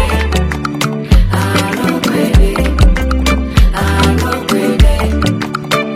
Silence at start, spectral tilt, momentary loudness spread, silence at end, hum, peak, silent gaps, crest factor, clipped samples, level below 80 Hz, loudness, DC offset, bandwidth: 0 s; -5.5 dB/octave; 4 LU; 0 s; none; 0 dBFS; none; 12 dB; 0.1%; -14 dBFS; -13 LUFS; under 0.1%; 16 kHz